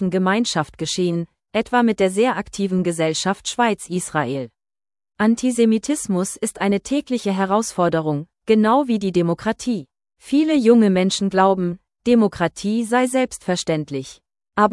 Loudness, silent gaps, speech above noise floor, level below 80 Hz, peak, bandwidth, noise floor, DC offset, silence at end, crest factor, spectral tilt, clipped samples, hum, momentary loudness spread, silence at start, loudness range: -20 LUFS; none; over 71 dB; -54 dBFS; -2 dBFS; 12 kHz; under -90 dBFS; under 0.1%; 0 s; 18 dB; -5 dB/octave; under 0.1%; none; 9 LU; 0 s; 3 LU